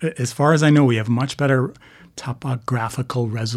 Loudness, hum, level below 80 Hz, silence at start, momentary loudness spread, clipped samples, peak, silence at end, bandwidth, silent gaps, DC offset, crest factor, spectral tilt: -19 LUFS; none; -58 dBFS; 0 s; 14 LU; under 0.1%; -2 dBFS; 0 s; 13.5 kHz; none; under 0.1%; 16 dB; -6.5 dB/octave